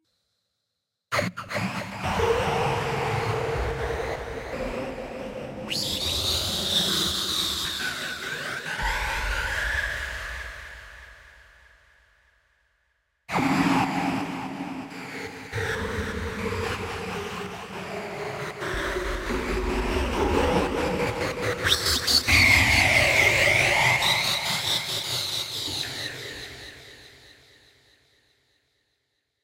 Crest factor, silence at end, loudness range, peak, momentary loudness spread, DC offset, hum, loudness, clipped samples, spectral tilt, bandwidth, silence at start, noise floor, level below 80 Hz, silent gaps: 22 dB; 2.1 s; 13 LU; -6 dBFS; 17 LU; under 0.1%; none; -24 LUFS; under 0.1%; -3 dB/octave; 16 kHz; 1.1 s; -81 dBFS; -40 dBFS; none